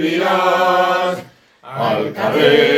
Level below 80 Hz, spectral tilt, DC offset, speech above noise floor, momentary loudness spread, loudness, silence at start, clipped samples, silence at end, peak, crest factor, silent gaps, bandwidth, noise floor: -64 dBFS; -5 dB/octave; under 0.1%; 26 dB; 9 LU; -15 LUFS; 0 s; under 0.1%; 0 s; 0 dBFS; 16 dB; none; 16.5 kHz; -40 dBFS